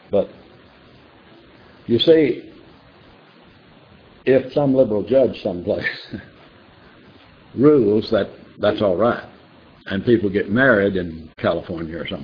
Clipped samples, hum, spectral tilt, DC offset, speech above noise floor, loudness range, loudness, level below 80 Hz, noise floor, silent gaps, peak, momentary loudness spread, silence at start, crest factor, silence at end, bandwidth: under 0.1%; none; -8.5 dB/octave; under 0.1%; 31 dB; 3 LU; -19 LUFS; -52 dBFS; -48 dBFS; none; -2 dBFS; 15 LU; 0.1 s; 20 dB; 0 s; 5.4 kHz